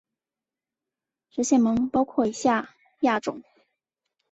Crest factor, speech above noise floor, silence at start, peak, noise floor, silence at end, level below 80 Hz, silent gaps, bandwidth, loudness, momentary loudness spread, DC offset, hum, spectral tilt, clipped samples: 18 dB; over 67 dB; 1.35 s; -8 dBFS; under -90 dBFS; 0.9 s; -62 dBFS; none; 8.2 kHz; -24 LUFS; 15 LU; under 0.1%; none; -4.5 dB/octave; under 0.1%